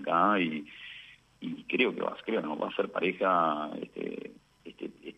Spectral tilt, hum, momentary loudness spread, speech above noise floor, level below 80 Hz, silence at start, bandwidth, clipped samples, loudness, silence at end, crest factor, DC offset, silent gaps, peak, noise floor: -7 dB/octave; none; 18 LU; 22 dB; -74 dBFS; 0 s; 9.2 kHz; under 0.1%; -30 LUFS; 0.05 s; 20 dB; under 0.1%; none; -10 dBFS; -52 dBFS